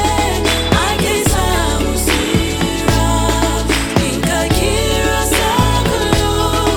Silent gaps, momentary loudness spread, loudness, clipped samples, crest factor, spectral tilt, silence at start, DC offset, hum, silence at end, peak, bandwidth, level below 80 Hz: none; 2 LU; -14 LUFS; under 0.1%; 14 dB; -4 dB/octave; 0 s; under 0.1%; none; 0 s; 0 dBFS; 18.5 kHz; -22 dBFS